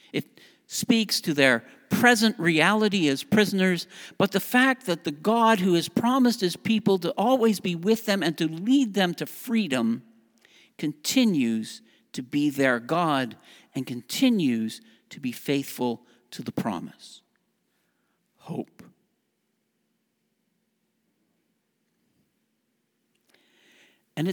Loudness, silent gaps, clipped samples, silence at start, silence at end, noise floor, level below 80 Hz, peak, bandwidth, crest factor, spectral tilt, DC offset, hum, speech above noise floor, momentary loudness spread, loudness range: -24 LUFS; none; under 0.1%; 0.15 s; 0 s; -75 dBFS; -72 dBFS; -2 dBFS; over 20 kHz; 24 dB; -4.5 dB/octave; under 0.1%; none; 51 dB; 15 LU; 19 LU